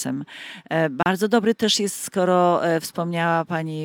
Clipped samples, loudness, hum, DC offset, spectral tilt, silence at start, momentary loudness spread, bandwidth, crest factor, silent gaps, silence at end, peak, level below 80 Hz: under 0.1%; -21 LUFS; none; under 0.1%; -4.5 dB/octave; 0 s; 9 LU; 18 kHz; 18 dB; none; 0 s; -4 dBFS; -66 dBFS